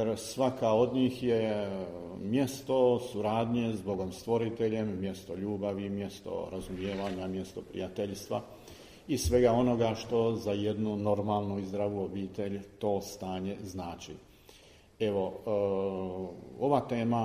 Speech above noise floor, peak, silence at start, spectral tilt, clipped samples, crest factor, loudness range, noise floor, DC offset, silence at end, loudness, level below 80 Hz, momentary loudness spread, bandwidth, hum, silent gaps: 26 dB; -12 dBFS; 0 s; -6.5 dB/octave; under 0.1%; 20 dB; 7 LU; -58 dBFS; under 0.1%; 0 s; -32 LUFS; -54 dBFS; 12 LU; 15.5 kHz; none; none